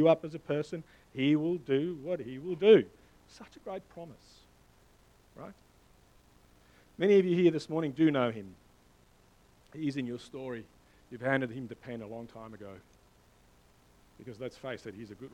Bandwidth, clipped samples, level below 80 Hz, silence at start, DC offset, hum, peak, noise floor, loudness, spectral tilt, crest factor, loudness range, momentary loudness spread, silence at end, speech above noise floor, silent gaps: 10 kHz; under 0.1%; -68 dBFS; 0 s; under 0.1%; 60 Hz at -65 dBFS; -10 dBFS; -63 dBFS; -31 LUFS; -7.5 dB/octave; 24 dB; 17 LU; 25 LU; 0.05 s; 32 dB; none